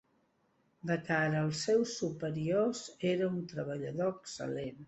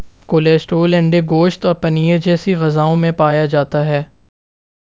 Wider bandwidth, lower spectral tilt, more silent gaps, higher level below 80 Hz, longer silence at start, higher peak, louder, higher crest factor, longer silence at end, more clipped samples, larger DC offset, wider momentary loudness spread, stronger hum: first, 8.4 kHz vs 7.6 kHz; second, -5.5 dB/octave vs -8 dB/octave; neither; second, -70 dBFS vs -48 dBFS; first, 0.85 s vs 0 s; second, -16 dBFS vs 0 dBFS; second, -34 LUFS vs -14 LUFS; about the same, 18 dB vs 14 dB; second, 0 s vs 0.85 s; neither; neither; first, 8 LU vs 4 LU; neither